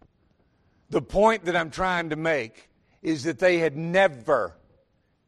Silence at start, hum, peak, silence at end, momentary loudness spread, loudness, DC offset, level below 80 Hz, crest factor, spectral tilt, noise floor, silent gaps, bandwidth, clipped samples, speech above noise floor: 0.9 s; none; -6 dBFS; 0.8 s; 9 LU; -24 LUFS; under 0.1%; -50 dBFS; 20 dB; -5.5 dB/octave; -67 dBFS; none; 11.5 kHz; under 0.1%; 43 dB